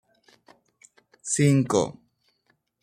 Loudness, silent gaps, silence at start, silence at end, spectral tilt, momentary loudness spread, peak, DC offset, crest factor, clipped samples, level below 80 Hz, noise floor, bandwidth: -23 LUFS; none; 1.25 s; 0.9 s; -5.5 dB/octave; 13 LU; -8 dBFS; under 0.1%; 20 dB; under 0.1%; -64 dBFS; -70 dBFS; 14 kHz